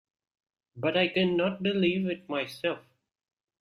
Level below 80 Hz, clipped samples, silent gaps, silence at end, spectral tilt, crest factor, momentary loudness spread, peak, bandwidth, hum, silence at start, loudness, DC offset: -68 dBFS; under 0.1%; none; 0.8 s; -6.5 dB/octave; 18 dB; 8 LU; -12 dBFS; 13.5 kHz; none; 0.75 s; -28 LUFS; under 0.1%